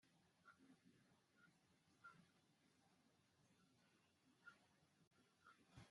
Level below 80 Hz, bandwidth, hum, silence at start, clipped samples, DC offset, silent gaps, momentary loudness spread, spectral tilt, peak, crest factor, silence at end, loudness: under -90 dBFS; 11.5 kHz; none; 0 s; under 0.1%; under 0.1%; 5.07-5.11 s; 2 LU; -4.5 dB/octave; -50 dBFS; 24 dB; 0 s; -69 LUFS